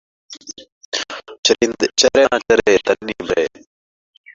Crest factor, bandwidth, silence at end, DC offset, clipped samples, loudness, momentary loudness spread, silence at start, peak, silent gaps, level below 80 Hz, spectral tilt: 18 dB; 7.8 kHz; 0.85 s; under 0.1%; under 0.1%; -16 LUFS; 20 LU; 0.3 s; 0 dBFS; 0.72-0.92 s, 1.39-1.43 s; -50 dBFS; -2 dB/octave